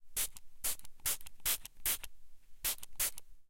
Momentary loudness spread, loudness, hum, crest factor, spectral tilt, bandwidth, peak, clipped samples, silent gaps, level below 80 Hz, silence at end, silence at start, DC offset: 4 LU; -37 LUFS; none; 20 dB; 1 dB/octave; 17 kHz; -18 dBFS; under 0.1%; none; -56 dBFS; 0.05 s; 0 s; under 0.1%